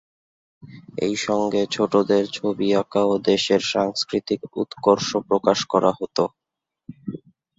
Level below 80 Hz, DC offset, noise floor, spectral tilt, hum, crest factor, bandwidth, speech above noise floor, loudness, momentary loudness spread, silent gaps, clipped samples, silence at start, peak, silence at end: -62 dBFS; under 0.1%; -85 dBFS; -4.5 dB/octave; none; 20 dB; 8 kHz; 64 dB; -21 LUFS; 10 LU; none; under 0.1%; 0.65 s; -2 dBFS; 0.4 s